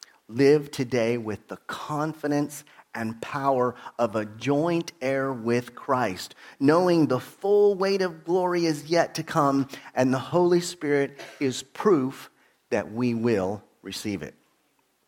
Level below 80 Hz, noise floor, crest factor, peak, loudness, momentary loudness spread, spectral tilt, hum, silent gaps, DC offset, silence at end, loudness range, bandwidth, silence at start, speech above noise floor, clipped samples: -68 dBFS; -69 dBFS; 18 dB; -6 dBFS; -25 LUFS; 13 LU; -6 dB/octave; none; none; under 0.1%; 0.8 s; 5 LU; 17 kHz; 0.3 s; 44 dB; under 0.1%